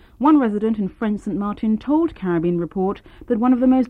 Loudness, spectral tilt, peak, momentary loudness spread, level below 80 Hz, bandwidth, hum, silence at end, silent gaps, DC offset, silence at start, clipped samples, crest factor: -20 LUFS; -9.5 dB/octave; -4 dBFS; 9 LU; -48 dBFS; 4.6 kHz; none; 0 s; none; under 0.1%; 0.2 s; under 0.1%; 14 dB